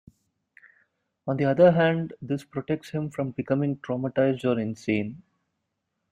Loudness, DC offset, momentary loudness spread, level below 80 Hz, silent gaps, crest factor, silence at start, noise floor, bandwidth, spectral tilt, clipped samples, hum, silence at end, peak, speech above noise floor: -25 LUFS; under 0.1%; 13 LU; -64 dBFS; none; 20 dB; 1.25 s; -80 dBFS; 11 kHz; -8 dB/octave; under 0.1%; none; 0.95 s; -6 dBFS; 55 dB